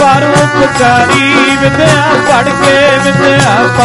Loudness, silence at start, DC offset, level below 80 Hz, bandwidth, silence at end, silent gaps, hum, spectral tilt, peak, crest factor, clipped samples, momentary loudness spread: -7 LUFS; 0 s; under 0.1%; -34 dBFS; 12 kHz; 0 s; none; none; -4.5 dB/octave; 0 dBFS; 6 dB; 0.5%; 2 LU